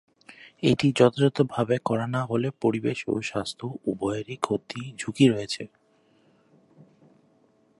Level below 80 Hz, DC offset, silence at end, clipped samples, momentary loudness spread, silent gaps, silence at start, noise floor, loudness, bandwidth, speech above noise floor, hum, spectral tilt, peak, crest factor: -62 dBFS; under 0.1%; 2.15 s; under 0.1%; 13 LU; none; 0.4 s; -63 dBFS; -26 LUFS; 11.5 kHz; 38 dB; none; -6 dB/octave; -4 dBFS; 22 dB